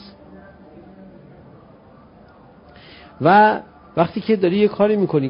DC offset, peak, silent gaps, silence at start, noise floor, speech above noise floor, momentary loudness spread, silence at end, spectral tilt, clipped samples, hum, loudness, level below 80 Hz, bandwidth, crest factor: under 0.1%; -2 dBFS; none; 3.2 s; -47 dBFS; 31 dB; 9 LU; 0 s; -11.5 dB/octave; under 0.1%; none; -17 LUFS; -56 dBFS; 5.4 kHz; 18 dB